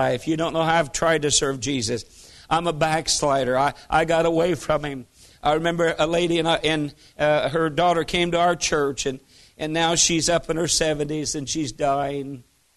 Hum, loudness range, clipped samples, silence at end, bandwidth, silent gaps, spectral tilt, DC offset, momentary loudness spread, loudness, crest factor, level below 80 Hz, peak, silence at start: none; 1 LU; under 0.1%; 0.35 s; 12.5 kHz; none; -3.5 dB/octave; under 0.1%; 8 LU; -22 LUFS; 18 dB; -46 dBFS; -4 dBFS; 0 s